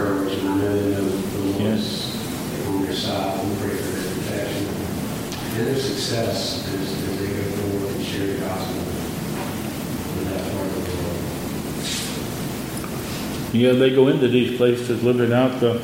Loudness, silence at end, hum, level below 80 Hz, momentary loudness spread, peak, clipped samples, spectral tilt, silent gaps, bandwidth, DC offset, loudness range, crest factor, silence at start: -23 LUFS; 0 s; none; -46 dBFS; 9 LU; -4 dBFS; under 0.1%; -5.5 dB/octave; none; 16.5 kHz; under 0.1%; 6 LU; 18 dB; 0 s